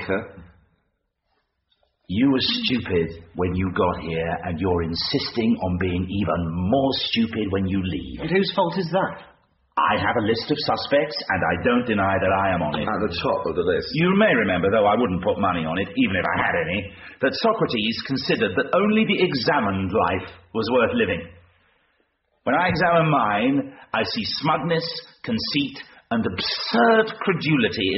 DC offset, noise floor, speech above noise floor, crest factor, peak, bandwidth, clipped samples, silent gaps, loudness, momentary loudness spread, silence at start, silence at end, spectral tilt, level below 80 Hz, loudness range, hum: under 0.1%; -73 dBFS; 51 dB; 16 dB; -8 dBFS; 6 kHz; under 0.1%; none; -22 LUFS; 8 LU; 0 s; 0 s; -3.5 dB/octave; -48 dBFS; 3 LU; none